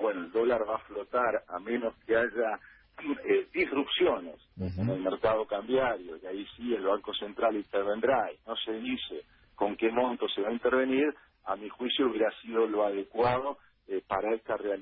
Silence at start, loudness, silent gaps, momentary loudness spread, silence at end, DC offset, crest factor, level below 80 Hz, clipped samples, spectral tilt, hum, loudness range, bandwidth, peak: 0 s; -31 LUFS; none; 10 LU; 0 s; under 0.1%; 16 dB; -60 dBFS; under 0.1%; -9 dB/octave; none; 2 LU; 5.4 kHz; -14 dBFS